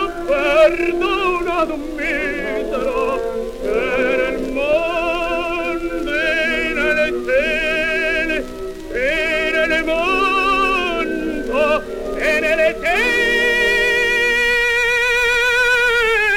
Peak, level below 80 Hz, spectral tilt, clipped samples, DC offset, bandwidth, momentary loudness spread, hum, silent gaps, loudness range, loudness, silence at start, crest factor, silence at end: -2 dBFS; -34 dBFS; -3 dB/octave; under 0.1%; under 0.1%; 17 kHz; 8 LU; none; none; 5 LU; -17 LUFS; 0 s; 16 dB; 0 s